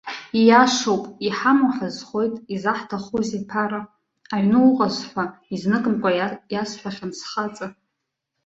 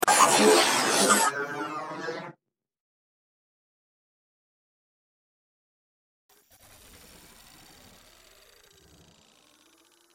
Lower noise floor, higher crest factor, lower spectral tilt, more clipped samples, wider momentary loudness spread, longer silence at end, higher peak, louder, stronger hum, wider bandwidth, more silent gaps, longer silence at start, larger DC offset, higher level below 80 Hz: first, -79 dBFS vs -69 dBFS; about the same, 20 dB vs 24 dB; first, -5 dB/octave vs -1.5 dB/octave; neither; second, 13 LU vs 18 LU; second, 0.75 s vs 7.85 s; first, -2 dBFS vs -6 dBFS; about the same, -21 LUFS vs -22 LUFS; neither; second, 8 kHz vs 16.5 kHz; neither; about the same, 0.05 s vs 0 s; neither; first, -62 dBFS vs -70 dBFS